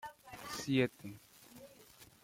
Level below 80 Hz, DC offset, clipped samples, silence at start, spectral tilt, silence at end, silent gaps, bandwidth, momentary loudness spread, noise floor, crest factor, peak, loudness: -72 dBFS; under 0.1%; under 0.1%; 0.05 s; -5 dB/octave; 0.2 s; none; 16.5 kHz; 24 LU; -61 dBFS; 22 dB; -18 dBFS; -36 LUFS